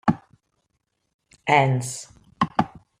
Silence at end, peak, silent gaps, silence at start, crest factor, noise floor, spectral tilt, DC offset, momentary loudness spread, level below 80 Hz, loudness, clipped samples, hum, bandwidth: 0.35 s; -4 dBFS; 1.14-1.19 s; 0.05 s; 22 dB; -75 dBFS; -5.5 dB/octave; under 0.1%; 15 LU; -58 dBFS; -23 LUFS; under 0.1%; none; 15 kHz